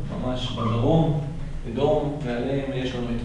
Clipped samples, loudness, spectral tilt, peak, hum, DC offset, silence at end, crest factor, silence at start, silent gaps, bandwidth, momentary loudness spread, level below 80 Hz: under 0.1%; -25 LUFS; -7.5 dB/octave; -8 dBFS; none; under 0.1%; 0 s; 16 dB; 0 s; none; 10.5 kHz; 9 LU; -34 dBFS